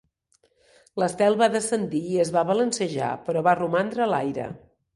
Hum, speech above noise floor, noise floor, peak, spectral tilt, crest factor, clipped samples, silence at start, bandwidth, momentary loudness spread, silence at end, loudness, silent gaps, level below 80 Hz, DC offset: none; 43 dB; -66 dBFS; -6 dBFS; -5 dB/octave; 18 dB; under 0.1%; 0.95 s; 11.5 kHz; 9 LU; 0.35 s; -24 LUFS; none; -64 dBFS; under 0.1%